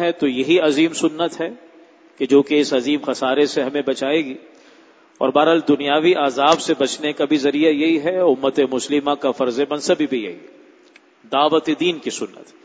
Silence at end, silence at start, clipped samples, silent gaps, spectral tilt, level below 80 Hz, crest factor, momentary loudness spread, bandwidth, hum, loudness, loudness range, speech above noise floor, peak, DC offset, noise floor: 0.2 s; 0 s; under 0.1%; none; -4 dB/octave; -66 dBFS; 18 dB; 9 LU; 8 kHz; none; -18 LUFS; 4 LU; 33 dB; 0 dBFS; under 0.1%; -51 dBFS